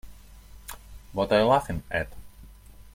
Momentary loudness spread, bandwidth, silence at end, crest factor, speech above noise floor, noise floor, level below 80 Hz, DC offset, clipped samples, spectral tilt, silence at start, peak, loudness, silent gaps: 23 LU; 16.5 kHz; 0.1 s; 22 dB; 24 dB; -48 dBFS; -46 dBFS; under 0.1%; under 0.1%; -5.5 dB/octave; 0.05 s; -8 dBFS; -26 LUFS; none